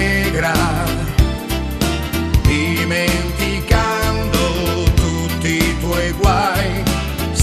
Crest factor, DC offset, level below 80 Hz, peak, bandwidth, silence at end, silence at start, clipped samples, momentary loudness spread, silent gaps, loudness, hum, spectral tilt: 16 dB; under 0.1%; -22 dBFS; 0 dBFS; 14 kHz; 0 s; 0 s; under 0.1%; 4 LU; none; -17 LUFS; none; -5 dB/octave